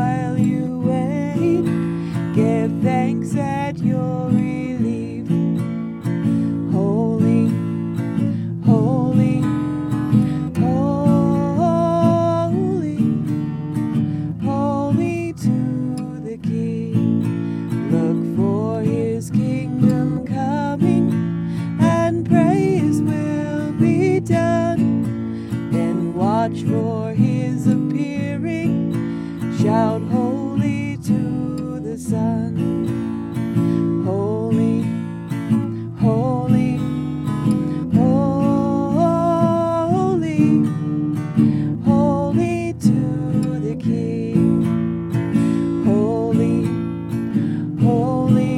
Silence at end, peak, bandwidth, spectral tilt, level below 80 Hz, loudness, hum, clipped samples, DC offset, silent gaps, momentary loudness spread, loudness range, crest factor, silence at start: 0 s; -2 dBFS; 12 kHz; -8.5 dB/octave; -48 dBFS; -19 LUFS; none; under 0.1%; under 0.1%; none; 7 LU; 3 LU; 16 dB; 0 s